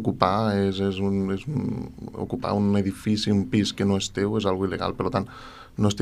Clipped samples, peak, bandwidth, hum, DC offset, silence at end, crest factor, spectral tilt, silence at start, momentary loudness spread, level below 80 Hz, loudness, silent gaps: under 0.1%; -2 dBFS; 12 kHz; none; under 0.1%; 0 s; 24 dB; -6 dB/octave; 0 s; 10 LU; -50 dBFS; -25 LUFS; none